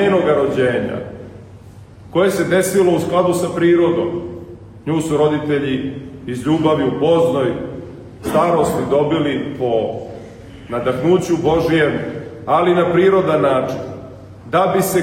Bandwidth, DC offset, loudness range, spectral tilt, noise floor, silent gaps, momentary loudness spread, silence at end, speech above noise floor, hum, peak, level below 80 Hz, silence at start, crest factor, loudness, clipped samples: 16.5 kHz; under 0.1%; 3 LU; -6 dB/octave; -39 dBFS; none; 17 LU; 0 s; 23 dB; none; -2 dBFS; -46 dBFS; 0 s; 14 dB; -17 LUFS; under 0.1%